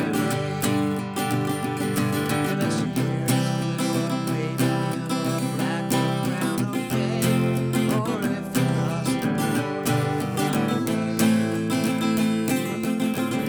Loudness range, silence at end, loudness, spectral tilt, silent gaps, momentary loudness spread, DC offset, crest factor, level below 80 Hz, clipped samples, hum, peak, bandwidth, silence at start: 1 LU; 0 s; -24 LUFS; -5.5 dB/octave; none; 3 LU; under 0.1%; 14 dB; -58 dBFS; under 0.1%; none; -8 dBFS; over 20 kHz; 0 s